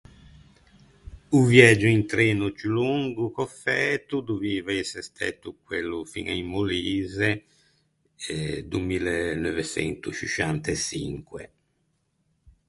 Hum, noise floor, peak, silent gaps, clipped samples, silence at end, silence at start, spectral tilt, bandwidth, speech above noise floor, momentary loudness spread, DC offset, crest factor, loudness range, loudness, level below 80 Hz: none; -72 dBFS; 0 dBFS; none; under 0.1%; 1.2 s; 1.1 s; -5 dB/octave; 11.5 kHz; 47 dB; 13 LU; under 0.1%; 26 dB; 8 LU; -24 LUFS; -50 dBFS